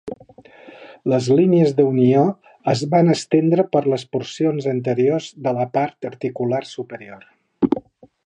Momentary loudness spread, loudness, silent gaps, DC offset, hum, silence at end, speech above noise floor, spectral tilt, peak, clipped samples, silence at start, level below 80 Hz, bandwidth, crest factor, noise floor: 12 LU; -19 LUFS; none; under 0.1%; none; 0.5 s; 28 dB; -7 dB/octave; -2 dBFS; under 0.1%; 0.05 s; -62 dBFS; 10 kHz; 18 dB; -46 dBFS